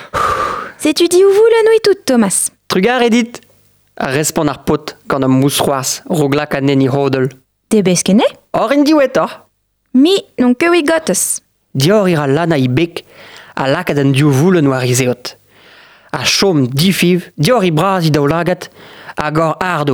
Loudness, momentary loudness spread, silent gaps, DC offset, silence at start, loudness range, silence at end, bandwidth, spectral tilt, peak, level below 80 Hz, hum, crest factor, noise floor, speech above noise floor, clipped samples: -13 LUFS; 9 LU; none; under 0.1%; 0 s; 3 LU; 0 s; over 20 kHz; -5 dB/octave; 0 dBFS; -46 dBFS; none; 12 dB; -60 dBFS; 48 dB; under 0.1%